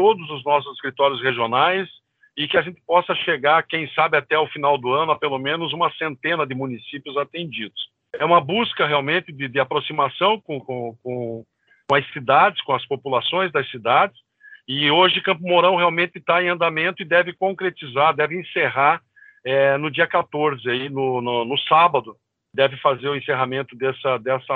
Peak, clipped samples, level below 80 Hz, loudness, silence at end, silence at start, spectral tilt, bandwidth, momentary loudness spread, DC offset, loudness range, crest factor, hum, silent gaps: -2 dBFS; under 0.1%; -68 dBFS; -20 LUFS; 0 s; 0 s; -7 dB/octave; 4.7 kHz; 11 LU; under 0.1%; 4 LU; 18 dB; none; none